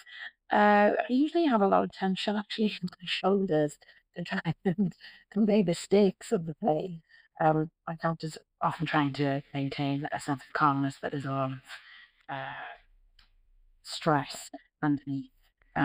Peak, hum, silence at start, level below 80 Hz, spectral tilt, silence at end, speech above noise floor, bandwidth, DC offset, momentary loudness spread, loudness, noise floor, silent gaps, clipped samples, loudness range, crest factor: -12 dBFS; none; 0.05 s; -66 dBFS; -6 dB/octave; 0 s; 34 dB; 15.5 kHz; under 0.1%; 16 LU; -29 LUFS; -63 dBFS; none; under 0.1%; 8 LU; 18 dB